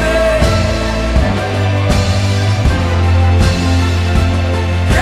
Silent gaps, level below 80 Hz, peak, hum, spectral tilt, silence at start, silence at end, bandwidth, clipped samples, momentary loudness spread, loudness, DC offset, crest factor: none; -18 dBFS; 0 dBFS; none; -6 dB/octave; 0 s; 0 s; 12.5 kHz; under 0.1%; 4 LU; -13 LUFS; 0.8%; 12 dB